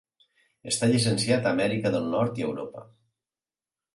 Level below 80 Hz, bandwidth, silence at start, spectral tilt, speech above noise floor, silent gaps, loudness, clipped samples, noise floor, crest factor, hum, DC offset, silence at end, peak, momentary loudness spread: -64 dBFS; 11.5 kHz; 0.65 s; -5 dB/octave; over 65 dB; none; -26 LUFS; under 0.1%; under -90 dBFS; 18 dB; none; under 0.1%; 1.1 s; -10 dBFS; 16 LU